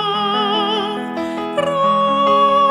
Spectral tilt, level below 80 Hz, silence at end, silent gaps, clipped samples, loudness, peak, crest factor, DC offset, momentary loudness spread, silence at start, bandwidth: -5 dB/octave; -56 dBFS; 0 s; none; under 0.1%; -16 LUFS; -4 dBFS; 12 dB; under 0.1%; 10 LU; 0 s; 11.5 kHz